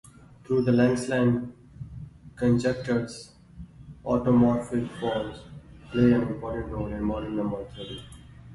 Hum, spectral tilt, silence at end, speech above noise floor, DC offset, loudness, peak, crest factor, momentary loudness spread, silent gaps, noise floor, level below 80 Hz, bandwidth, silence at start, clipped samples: none; -7.5 dB/octave; 0 s; 21 dB; under 0.1%; -26 LUFS; -10 dBFS; 18 dB; 23 LU; none; -46 dBFS; -48 dBFS; 11.5 kHz; 0.5 s; under 0.1%